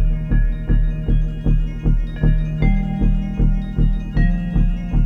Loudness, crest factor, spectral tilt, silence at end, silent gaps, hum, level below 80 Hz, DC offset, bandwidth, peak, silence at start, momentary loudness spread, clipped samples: -21 LUFS; 12 dB; -9.5 dB/octave; 0 s; none; none; -18 dBFS; under 0.1%; 4 kHz; -4 dBFS; 0 s; 2 LU; under 0.1%